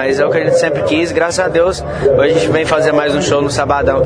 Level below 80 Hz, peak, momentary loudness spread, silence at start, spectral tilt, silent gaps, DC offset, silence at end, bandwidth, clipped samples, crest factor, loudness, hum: -34 dBFS; 0 dBFS; 3 LU; 0 s; -5 dB/octave; none; under 0.1%; 0 s; 10.5 kHz; under 0.1%; 12 dB; -13 LUFS; none